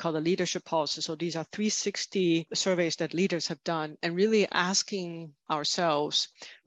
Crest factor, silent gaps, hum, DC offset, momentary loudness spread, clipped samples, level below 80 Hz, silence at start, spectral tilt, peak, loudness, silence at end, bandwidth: 20 dB; none; none; under 0.1%; 8 LU; under 0.1%; -76 dBFS; 0 s; -3.5 dB/octave; -10 dBFS; -29 LUFS; 0.15 s; 9.2 kHz